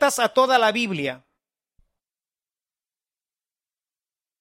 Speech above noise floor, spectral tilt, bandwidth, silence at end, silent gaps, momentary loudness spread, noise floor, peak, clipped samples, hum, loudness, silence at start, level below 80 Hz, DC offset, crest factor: over 69 dB; -3 dB/octave; 16 kHz; 3.25 s; none; 10 LU; under -90 dBFS; -6 dBFS; under 0.1%; none; -20 LUFS; 0 s; -72 dBFS; under 0.1%; 20 dB